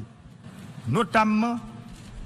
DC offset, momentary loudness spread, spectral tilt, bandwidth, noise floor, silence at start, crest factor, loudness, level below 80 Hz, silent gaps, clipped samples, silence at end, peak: under 0.1%; 23 LU; -6.5 dB/octave; 12.5 kHz; -46 dBFS; 0 s; 22 dB; -24 LUFS; -50 dBFS; none; under 0.1%; 0 s; -6 dBFS